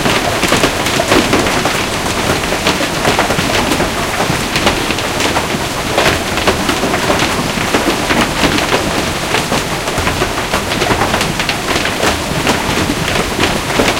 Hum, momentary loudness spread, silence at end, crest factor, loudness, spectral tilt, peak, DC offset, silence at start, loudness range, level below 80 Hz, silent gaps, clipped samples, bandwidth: none; 3 LU; 0 s; 14 dB; -13 LUFS; -3.5 dB/octave; 0 dBFS; under 0.1%; 0 s; 1 LU; -30 dBFS; none; under 0.1%; 17.5 kHz